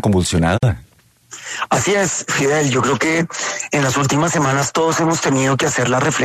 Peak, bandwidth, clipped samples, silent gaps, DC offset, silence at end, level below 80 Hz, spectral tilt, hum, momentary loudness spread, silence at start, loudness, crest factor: -4 dBFS; 14 kHz; under 0.1%; none; under 0.1%; 0 s; -42 dBFS; -4.5 dB/octave; none; 6 LU; 0.05 s; -16 LUFS; 14 dB